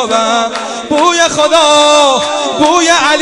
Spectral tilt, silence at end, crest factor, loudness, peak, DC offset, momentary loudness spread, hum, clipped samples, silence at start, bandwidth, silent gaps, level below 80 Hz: -1.5 dB/octave; 0 s; 10 dB; -9 LUFS; 0 dBFS; under 0.1%; 8 LU; none; 0.8%; 0 s; 12 kHz; none; -48 dBFS